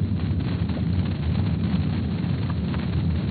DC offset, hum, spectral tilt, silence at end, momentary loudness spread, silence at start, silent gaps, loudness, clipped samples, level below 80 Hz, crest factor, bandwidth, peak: under 0.1%; none; -8 dB/octave; 0 s; 2 LU; 0 s; none; -25 LUFS; under 0.1%; -34 dBFS; 12 dB; 4.8 kHz; -12 dBFS